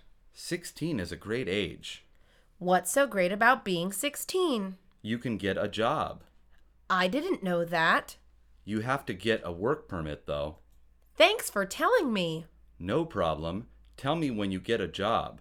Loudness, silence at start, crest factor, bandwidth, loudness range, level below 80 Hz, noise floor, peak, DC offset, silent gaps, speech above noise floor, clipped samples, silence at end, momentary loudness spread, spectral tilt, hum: -29 LUFS; 0.35 s; 22 dB; 19.5 kHz; 3 LU; -56 dBFS; -60 dBFS; -8 dBFS; under 0.1%; none; 31 dB; under 0.1%; 0 s; 13 LU; -4 dB/octave; none